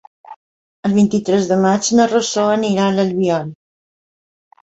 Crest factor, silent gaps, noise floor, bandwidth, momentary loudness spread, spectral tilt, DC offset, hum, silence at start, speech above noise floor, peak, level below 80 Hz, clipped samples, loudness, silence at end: 16 dB; 0.36-0.83 s; under -90 dBFS; 8.2 kHz; 5 LU; -5 dB/octave; under 0.1%; none; 0.3 s; over 75 dB; -2 dBFS; -56 dBFS; under 0.1%; -16 LUFS; 1.15 s